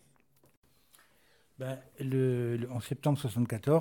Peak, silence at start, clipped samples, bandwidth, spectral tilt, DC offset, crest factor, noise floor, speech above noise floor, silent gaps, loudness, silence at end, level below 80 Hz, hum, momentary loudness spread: -16 dBFS; 1.6 s; under 0.1%; 19 kHz; -7.5 dB/octave; under 0.1%; 18 dB; -68 dBFS; 37 dB; none; -33 LUFS; 0 s; -68 dBFS; none; 11 LU